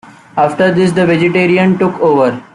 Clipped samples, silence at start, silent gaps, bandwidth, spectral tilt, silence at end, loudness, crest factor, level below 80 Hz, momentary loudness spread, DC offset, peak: under 0.1%; 0.05 s; none; 11 kHz; -7 dB/octave; 0.1 s; -11 LUFS; 10 dB; -52 dBFS; 4 LU; under 0.1%; -2 dBFS